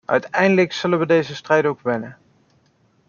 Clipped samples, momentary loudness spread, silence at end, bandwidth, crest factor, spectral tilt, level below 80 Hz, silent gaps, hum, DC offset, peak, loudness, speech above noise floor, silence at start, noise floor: under 0.1%; 8 LU; 0.95 s; 7.2 kHz; 18 dB; -6 dB/octave; -64 dBFS; none; none; under 0.1%; -2 dBFS; -19 LUFS; 41 dB; 0.1 s; -60 dBFS